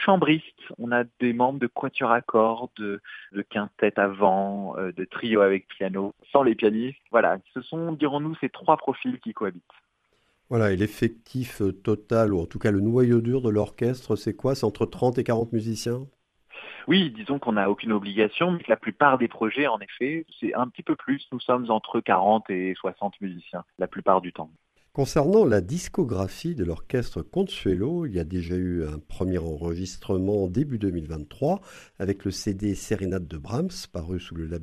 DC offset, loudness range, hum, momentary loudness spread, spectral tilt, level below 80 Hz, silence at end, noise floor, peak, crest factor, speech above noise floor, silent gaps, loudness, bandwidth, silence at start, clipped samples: under 0.1%; 4 LU; none; 12 LU; -6.5 dB/octave; -48 dBFS; 0 s; -69 dBFS; -2 dBFS; 22 dB; 44 dB; none; -25 LUFS; 13.5 kHz; 0 s; under 0.1%